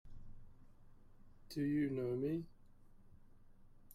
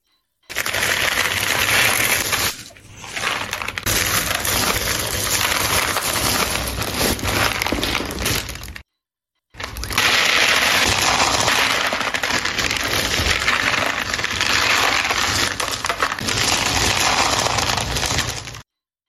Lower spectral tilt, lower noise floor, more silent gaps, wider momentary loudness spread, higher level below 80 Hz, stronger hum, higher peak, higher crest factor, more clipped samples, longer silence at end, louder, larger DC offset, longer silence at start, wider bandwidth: first, -8 dB/octave vs -1.5 dB/octave; second, -61 dBFS vs -82 dBFS; neither; first, 23 LU vs 8 LU; second, -62 dBFS vs -38 dBFS; neither; second, -28 dBFS vs -2 dBFS; about the same, 16 dB vs 18 dB; neither; second, 0 s vs 0.45 s; second, -40 LUFS vs -18 LUFS; neither; second, 0.05 s vs 0.5 s; about the same, 15.5 kHz vs 16 kHz